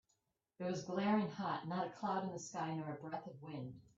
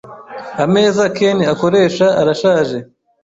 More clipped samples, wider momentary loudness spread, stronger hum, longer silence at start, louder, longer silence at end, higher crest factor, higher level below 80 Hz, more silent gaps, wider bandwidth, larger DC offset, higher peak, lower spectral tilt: neither; second, 12 LU vs 15 LU; neither; first, 0.6 s vs 0.05 s; second, -42 LUFS vs -14 LUFS; second, 0.15 s vs 0.4 s; first, 18 dB vs 12 dB; second, -80 dBFS vs -54 dBFS; neither; about the same, 7.8 kHz vs 8 kHz; neither; second, -24 dBFS vs -2 dBFS; about the same, -6 dB/octave vs -5.5 dB/octave